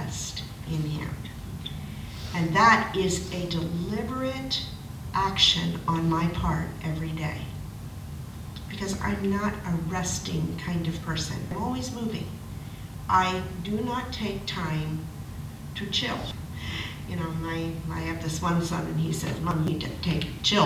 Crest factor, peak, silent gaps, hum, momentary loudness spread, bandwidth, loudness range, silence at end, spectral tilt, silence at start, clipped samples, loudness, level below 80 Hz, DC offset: 22 dB; -6 dBFS; none; none; 14 LU; 16 kHz; 6 LU; 0 s; -4.5 dB/octave; 0 s; under 0.1%; -28 LUFS; -42 dBFS; under 0.1%